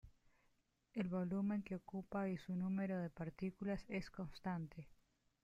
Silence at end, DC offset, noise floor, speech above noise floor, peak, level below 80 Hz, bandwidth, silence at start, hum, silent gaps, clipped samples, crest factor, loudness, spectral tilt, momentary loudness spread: 0.55 s; under 0.1%; -80 dBFS; 36 dB; -32 dBFS; -68 dBFS; 7.6 kHz; 0.05 s; none; none; under 0.1%; 14 dB; -45 LUFS; -8.5 dB/octave; 9 LU